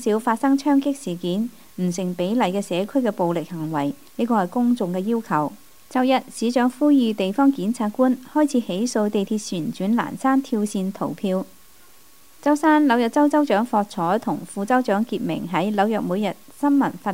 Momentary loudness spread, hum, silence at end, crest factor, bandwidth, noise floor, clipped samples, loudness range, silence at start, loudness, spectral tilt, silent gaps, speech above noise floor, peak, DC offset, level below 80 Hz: 9 LU; none; 0 s; 16 dB; 16 kHz; -52 dBFS; under 0.1%; 3 LU; 0 s; -22 LUFS; -6 dB/octave; none; 31 dB; -6 dBFS; 0.4%; -66 dBFS